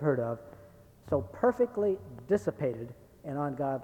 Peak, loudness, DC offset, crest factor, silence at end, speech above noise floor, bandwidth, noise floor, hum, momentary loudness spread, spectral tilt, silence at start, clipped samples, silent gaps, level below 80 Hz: -12 dBFS; -32 LUFS; under 0.1%; 20 dB; 0 s; 24 dB; 18.5 kHz; -55 dBFS; none; 14 LU; -9 dB/octave; 0 s; under 0.1%; none; -62 dBFS